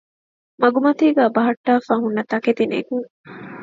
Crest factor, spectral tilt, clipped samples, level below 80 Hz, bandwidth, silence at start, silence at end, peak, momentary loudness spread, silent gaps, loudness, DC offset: 18 dB; -7 dB/octave; under 0.1%; -68 dBFS; 7.4 kHz; 0.6 s; 0 s; 0 dBFS; 12 LU; 1.57-1.64 s, 3.10-3.24 s; -19 LUFS; under 0.1%